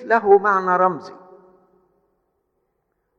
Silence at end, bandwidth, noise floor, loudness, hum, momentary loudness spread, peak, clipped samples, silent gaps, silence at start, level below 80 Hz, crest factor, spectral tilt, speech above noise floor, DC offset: 2.05 s; 6.8 kHz; -72 dBFS; -17 LUFS; none; 7 LU; -2 dBFS; under 0.1%; none; 0 s; -68 dBFS; 20 dB; -7.5 dB/octave; 55 dB; under 0.1%